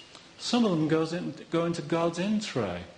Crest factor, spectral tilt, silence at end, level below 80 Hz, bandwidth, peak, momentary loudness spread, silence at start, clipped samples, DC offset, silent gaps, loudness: 16 dB; -5.5 dB/octave; 0.05 s; -64 dBFS; 10 kHz; -12 dBFS; 8 LU; 0 s; under 0.1%; under 0.1%; none; -29 LUFS